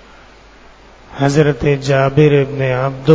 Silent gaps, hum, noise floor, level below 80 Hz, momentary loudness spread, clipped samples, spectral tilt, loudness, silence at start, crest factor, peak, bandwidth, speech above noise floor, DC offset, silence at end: none; none; -42 dBFS; -40 dBFS; 6 LU; 0.2%; -7 dB/octave; -14 LUFS; 1.1 s; 14 dB; 0 dBFS; 8 kHz; 29 dB; under 0.1%; 0 s